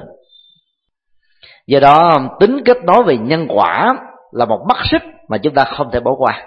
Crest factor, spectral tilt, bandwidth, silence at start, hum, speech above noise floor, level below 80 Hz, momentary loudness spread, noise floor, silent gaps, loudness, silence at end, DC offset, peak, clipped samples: 14 dB; -7.5 dB/octave; 6.8 kHz; 0 s; none; 58 dB; -42 dBFS; 10 LU; -70 dBFS; none; -13 LUFS; 0 s; under 0.1%; 0 dBFS; 0.1%